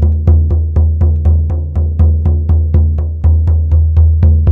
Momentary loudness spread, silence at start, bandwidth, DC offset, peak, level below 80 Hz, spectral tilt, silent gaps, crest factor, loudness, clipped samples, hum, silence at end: 4 LU; 0 s; 1.6 kHz; under 0.1%; 0 dBFS; -12 dBFS; -12 dB/octave; none; 8 dB; -12 LUFS; under 0.1%; none; 0 s